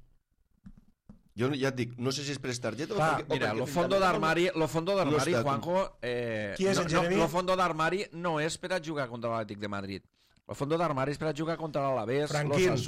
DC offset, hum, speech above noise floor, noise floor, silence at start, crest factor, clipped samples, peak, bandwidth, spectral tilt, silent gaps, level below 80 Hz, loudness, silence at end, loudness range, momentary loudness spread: under 0.1%; none; 40 dB; -70 dBFS; 0.65 s; 14 dB; under 0.1%; -16 dBFS; 16 kHz; -5 dB/octave; none; -56 dBFS; -30 LUFS; 0 s; 5 LU; 8 LU